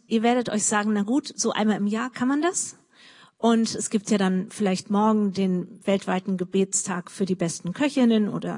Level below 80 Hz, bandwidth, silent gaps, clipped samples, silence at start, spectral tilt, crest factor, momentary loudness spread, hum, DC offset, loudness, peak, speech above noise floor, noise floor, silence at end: -72 dBFS; 11 kHz; none; under 0.1%; 0.1 s; -4.5 dB/octave; 16 dB; 5 LU; none; under 0.1%; -24 LUFS; -8 dBFS; 29 dB; -52 dBFS; 0 s